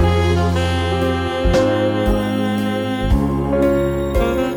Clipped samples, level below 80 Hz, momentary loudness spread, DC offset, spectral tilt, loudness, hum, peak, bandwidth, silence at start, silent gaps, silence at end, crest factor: under 0.1%; -26 dBFS; 3 LU; under 0.1%; -7 dB/octave; -18 LUFS; none; -6 dBFS; 20 kHz; 0 s; none; 0 s; 12 dB